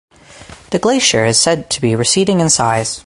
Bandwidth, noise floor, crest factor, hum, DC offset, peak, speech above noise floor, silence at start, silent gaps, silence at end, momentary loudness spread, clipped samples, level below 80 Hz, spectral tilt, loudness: 11.5 kHz; -38 dBFS; 14 dB; none; under 0.1%; 0 dBFS; 24 dB; 0.35 s; none; 0.05 s; 5 LU; under 0.1%; -46 dBFS; -3.5 dB/octave; -13 LUFS